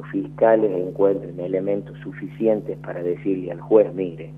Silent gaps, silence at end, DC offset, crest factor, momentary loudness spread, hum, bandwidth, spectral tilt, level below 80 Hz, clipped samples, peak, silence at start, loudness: none; 0 s; under 0.1%; 20 dB; 11 LU; 50 Hz at -40 dBFS; 3.8 kHz; -10 dB/octave; -56 dBFS; under 0.1%; -2 dBFS; 0 s; -22 LUFS